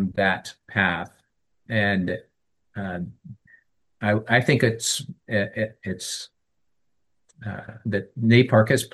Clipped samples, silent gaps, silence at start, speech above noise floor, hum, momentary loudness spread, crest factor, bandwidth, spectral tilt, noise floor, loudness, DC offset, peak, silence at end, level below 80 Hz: under 0.1%; none; 0 s; 57 dB; none; 17 LU; 22 dB; 12.5 kHz; -5 dB/octave; -80 dBFS; -23 LUFS; under 0.1%; -2 dBFS; 0.05 s; -64 dBFS